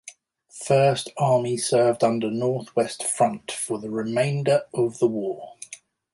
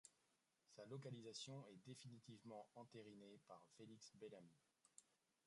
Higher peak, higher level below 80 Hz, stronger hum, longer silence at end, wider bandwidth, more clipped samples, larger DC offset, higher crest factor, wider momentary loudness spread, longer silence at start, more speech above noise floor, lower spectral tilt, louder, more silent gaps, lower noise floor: first, -8 dBFS vs -42 dBFS; first, -66 dBFS vs under -90 dBFS; neither; about the same, 0.35 s vs 0.3 s; about the same, 11.5 kHz vs 11 kHz; neither; neither; about the same, 16 dB vs 18 dB; first, 14 LU vs 10 LU; about the same, 0.05 s vs 0.05 s; about the same, 27 dB vs 26 dB; about the same, -5 dB/octave vs -4.5 dB/octave; first, -23 LUFS vs -60 LUFS; neither; second, -50 dBFS vs -87 dBFS